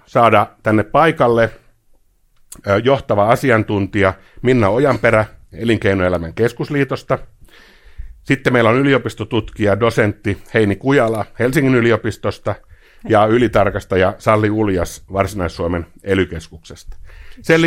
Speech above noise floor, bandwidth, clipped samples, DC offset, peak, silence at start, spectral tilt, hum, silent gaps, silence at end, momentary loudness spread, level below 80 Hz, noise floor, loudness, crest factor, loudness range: 37 dB; 16.5 kHz; under 0.1%; under 0.1%; 0 dBFS; 0.15 s; -6.5 dB/octave; none; none; 0 s; 10 LU; -40 dBFS; -53 dBFS; -16 LUFS; 16 dB; 3 LU